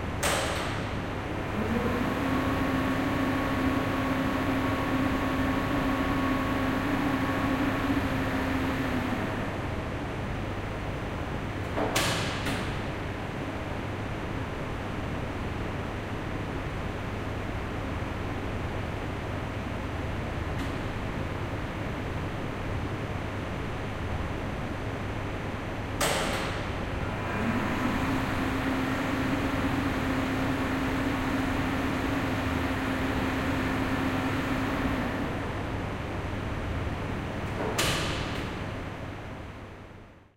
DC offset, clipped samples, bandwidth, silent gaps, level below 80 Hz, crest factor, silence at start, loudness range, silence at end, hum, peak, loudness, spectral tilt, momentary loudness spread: under 0.1%; under 0.1%; 16 kHz; none; -40 dBFS; 16 dB; 0 s; 6 LU; 0.1 s; none; -14 dBFS; -30 LUFS; -5.5 dB/octave; 6 LU